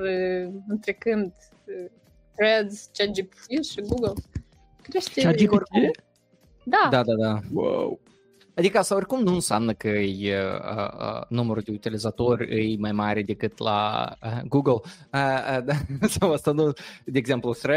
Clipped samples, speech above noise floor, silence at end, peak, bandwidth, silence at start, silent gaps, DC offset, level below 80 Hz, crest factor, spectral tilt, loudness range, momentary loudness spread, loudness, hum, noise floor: under 0.1%; 36 dB; 0 s; -6 dBFS; 16 kHz; 0 s; none; under 0.1%; -52 dBFS; 20 dB; -5.5 dB/octave; 4 LU; 12 LU; -25 LUFS; none; -60 dBFS